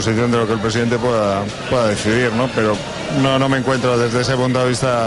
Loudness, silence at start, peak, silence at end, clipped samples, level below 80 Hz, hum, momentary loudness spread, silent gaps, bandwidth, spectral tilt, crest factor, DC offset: -17 LUFS; 0 s; -4 dBFS; 0 s; under 0.1%; -42 dBFS; none; 3 LU; none; 11.5 kHz; -5.5 dB/octave; 12 dB; under 0.1%